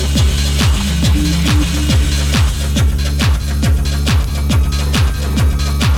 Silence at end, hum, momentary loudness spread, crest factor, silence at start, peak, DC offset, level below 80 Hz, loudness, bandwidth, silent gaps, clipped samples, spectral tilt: 0 s; none; 2 LU; 10 dB; 0 s; -2 dBFS; under 0.1%; -16 dBFS; -15 LUFS; 16.5 kHz; none; under 0.1%; -5 dB/octave